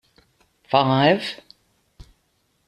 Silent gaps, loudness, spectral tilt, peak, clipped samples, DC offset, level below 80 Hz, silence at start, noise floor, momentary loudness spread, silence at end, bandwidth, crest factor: none; -20 LUFS; -6.5 dB/octave; -2 dBFS; under 0.1%; under 0.1%; -56 dBFS; 0.7 s; -68 dBFS; 15 LU; 1.3 s; 12.5 kHz; 22 dB